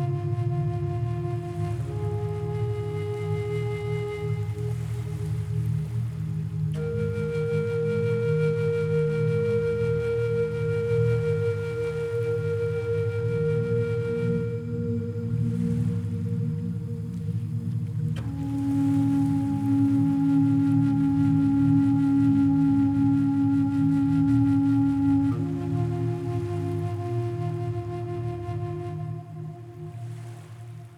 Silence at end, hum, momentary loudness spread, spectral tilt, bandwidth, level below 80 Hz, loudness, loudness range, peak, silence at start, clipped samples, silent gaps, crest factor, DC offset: 0 s; none; 10 LU; -9.5 dB/octave; 11 kHz; -48 dBFS; -26 LUFS; 8 LU; -12 dBFS; 0 s; under 0.1%; none; 14 dB; under 0.1%